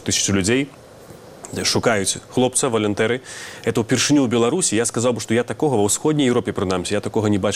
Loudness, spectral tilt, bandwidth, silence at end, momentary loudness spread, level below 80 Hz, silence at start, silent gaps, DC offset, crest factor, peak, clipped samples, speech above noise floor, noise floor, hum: -19 LUFS; -4 dB/octave; 16 kHz; 0 s; 6 LU; -52 dBFS; 0 s; none; under 0.1%; 18 dB; -2 dBFS; under 0.1%; 22 dB; -41 dBFS; none